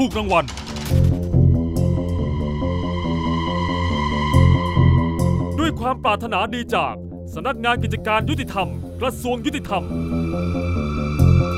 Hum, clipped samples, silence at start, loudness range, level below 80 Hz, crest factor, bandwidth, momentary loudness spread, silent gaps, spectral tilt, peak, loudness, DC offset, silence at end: none; under 0.1%; 0 s; 4 LU; -30 dBFS; 16 dB; 15 kHz; 8 LU; none; -7 dB/octave; -2 dBFS; -20 LUFS; under 0.1%; 0 s